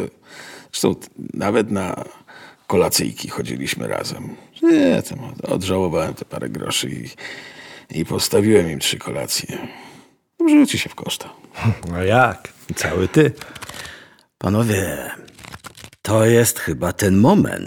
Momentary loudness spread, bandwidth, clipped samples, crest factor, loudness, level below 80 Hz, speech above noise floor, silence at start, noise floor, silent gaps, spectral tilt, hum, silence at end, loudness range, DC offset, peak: 21 LU; over 20 kHz; under 0.1%; 18 dB; -19 LUFS; -48 dBFS; 29 dB; 0 s; -48 dBFS; none; -5 dB/octave; none; 0 s; 3 LU; under 0.1%; -2 dBFS